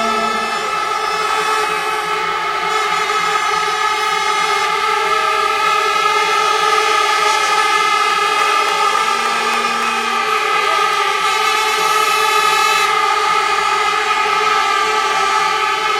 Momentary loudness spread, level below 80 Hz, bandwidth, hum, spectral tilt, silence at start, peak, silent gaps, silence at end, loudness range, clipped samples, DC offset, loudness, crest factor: 4 LU; -54 dBFS; 16.5 kHz; none; 0 dB/octave; 0 s; -2 dBFS; none; 0 s; 3 LU; under 0.1%; under 0.1%; -14 LUFS; 14 dB